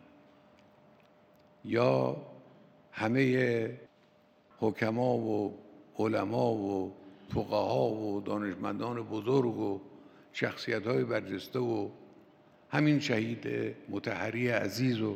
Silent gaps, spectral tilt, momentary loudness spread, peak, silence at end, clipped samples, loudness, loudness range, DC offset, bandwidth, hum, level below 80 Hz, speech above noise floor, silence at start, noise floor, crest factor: none; -7 dB/octave; 12 LU; -12 dBFS; 0 s; under 0.1%; -32 LUFS; 1 LU; under 0.1%; 16 kHz; none; -72 dBFS; 33 dB; 1.65 s; -64 dBFS; 22 dB